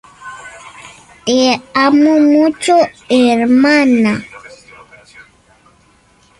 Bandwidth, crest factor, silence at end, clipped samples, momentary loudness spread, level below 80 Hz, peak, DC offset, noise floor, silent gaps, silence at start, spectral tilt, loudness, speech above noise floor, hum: 11.5 kHz; 12 dB; 2 s; under 0.1%; 23 LU; -54 dBFS; 0 dBFS; under 0.1%; -50 dBFS; none; 0.2 s; -4.5 dB/octave; -11 LUFS; 40 dB; none